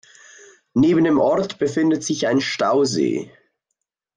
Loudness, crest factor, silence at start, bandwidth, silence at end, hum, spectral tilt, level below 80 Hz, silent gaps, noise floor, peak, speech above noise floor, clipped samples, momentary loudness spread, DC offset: -19 LUFS; 14 dB; 0.75 s; 9.8 kHz; 0.9 s; none; -5 dB/octave; -56 dBFS; none; -79 dBFS; -6 dBFS; 61 dB; under 0.1%; 7 LU; under 0.1%